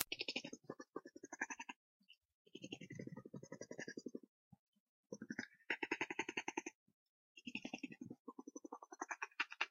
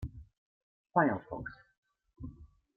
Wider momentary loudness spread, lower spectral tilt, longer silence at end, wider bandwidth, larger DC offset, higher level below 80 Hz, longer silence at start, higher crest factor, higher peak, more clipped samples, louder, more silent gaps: second, 14 LU vs 20 LU; second, -1.5 dB/octave vs -10 dB/octave; second, 0 s vs 0.3 s; first, 8 kHz vs 4.9 kHz; neither; second, under -90 dBFS vs -56 dBFS; about the same, 0 s vs 0 s; first, 42 dB vs 26 dB; about the same, -10 dBFS vs -12 dBFS; neither; second, -49 LUFS vs -33 LUFS; first, 1.76-2.00 s, 2.17-2.45 s, 4.29-4.51 s, 4.59-4.73 s, 4.80-5.03 s, 6.75-6.86 s, 6.94-7.35 s, 8.19-8.25 s vs 0.38-0.84 s, 1.78-1.83 s